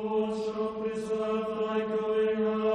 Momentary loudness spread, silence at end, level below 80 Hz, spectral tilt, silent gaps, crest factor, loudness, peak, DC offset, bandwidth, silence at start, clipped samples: 5 LU; 0 s; -64 dBFS; -6.5 dB/octave; none; 10 dB; -30 LUFS; -18 dBFS; under 0.1%; 9.8 kHz; 0 s; under 0.1%